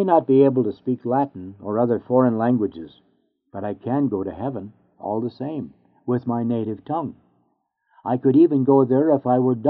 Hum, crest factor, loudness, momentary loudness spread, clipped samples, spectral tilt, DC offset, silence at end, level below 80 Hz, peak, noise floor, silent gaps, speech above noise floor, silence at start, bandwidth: none; 18 dB; -21 LUFS; 18 LU; under 0.1%; -9 dB/octave; under 0.1%; 0 s; -64 dBFS; -4 dBFS; -69 dBFS; none; 49 dB; 0 s; 4.6 kHz